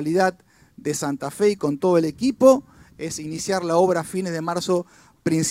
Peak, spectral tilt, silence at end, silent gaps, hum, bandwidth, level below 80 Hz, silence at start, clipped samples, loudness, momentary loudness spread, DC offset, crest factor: -2 dBFS; -5 dB/octave; 0 s; none; none; 16 kHz; -60 dBFS; 0 s; under 0.1%; -22 LUFS; 13 LU; under 0.1%; 20 dB